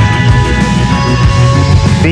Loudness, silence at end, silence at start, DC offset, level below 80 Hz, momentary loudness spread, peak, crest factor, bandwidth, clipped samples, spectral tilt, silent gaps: -9 LUFS; 0 s; 0 s; under 0.1%; -18 dBFS; 2 LU; 0 dBFS; 8 dB; 11 kHz; 0.7%; -6 dB/octave; none